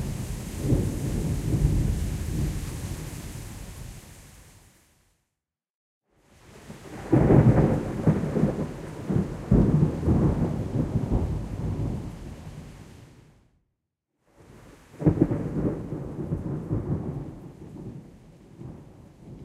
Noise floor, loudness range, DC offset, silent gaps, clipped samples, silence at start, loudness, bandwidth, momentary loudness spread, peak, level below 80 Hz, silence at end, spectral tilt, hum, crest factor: -86 dBFS; 14 LU; under 0.1%; 5.70-6.01 s; under 0.1%; 0 s; -26 LUFS; 15 kHz; 21 LU; -6 dBFS; -36 dBFS; 0 s; -8 dB/octave; none; 22 dB